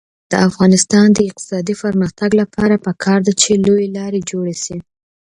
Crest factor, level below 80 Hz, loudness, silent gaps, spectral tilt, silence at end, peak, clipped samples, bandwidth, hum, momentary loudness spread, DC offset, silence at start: 14 dB; -48 dBFS; -14 LUFS; none; -5 dB/octave; 0.6 s; 0 dBFS; under 0.1%; 11 kHz; none; 11 LU; under 0.1%; 0.3 s